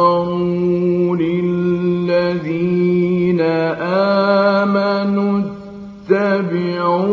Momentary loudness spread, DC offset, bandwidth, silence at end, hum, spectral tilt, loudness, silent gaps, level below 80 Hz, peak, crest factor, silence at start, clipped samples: 5 LU; under 0.1%; 6.2 kHz; 0 s; none; -9 dB/octave; -16 LUFS; none; -54 dBFS; -2 dBFS; 14 dB; 0 s; under 0.1%